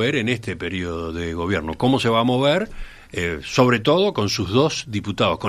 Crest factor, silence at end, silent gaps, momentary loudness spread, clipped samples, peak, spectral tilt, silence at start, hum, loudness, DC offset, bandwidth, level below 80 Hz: 18 dB; 0 s; none; 10 LU; under 0.1%; -2 dBFS; -5.5 dB/octave; 0 s; none; -21 LUFS; under 0.1%; 13.5 kHz; -44 dBFS